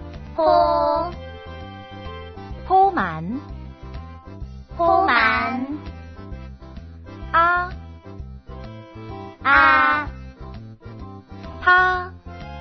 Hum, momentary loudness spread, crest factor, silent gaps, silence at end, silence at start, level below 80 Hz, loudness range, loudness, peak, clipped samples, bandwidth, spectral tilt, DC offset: none; 23 LU; 22 dB; none; 0 s; 0 s; -40 dBFS; 6 LU; -18 LUFS; 0 dBFS; under 0.1%; 6.2 kHz; -7 dB/octave; under 0.1%